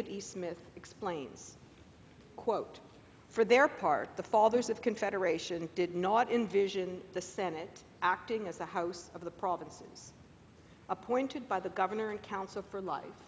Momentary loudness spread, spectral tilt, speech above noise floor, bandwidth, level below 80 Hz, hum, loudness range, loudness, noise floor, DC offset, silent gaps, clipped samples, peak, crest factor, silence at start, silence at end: 19 LU; -4.5 dB/octave; 24 dB; 8 kHz; -68 dBFS; none; 8 LU; -34 LUFS; -58 dBFS; under 0.1%; none; under 0.1%; -12 dBFS; 22 dB; 0 s; 0 s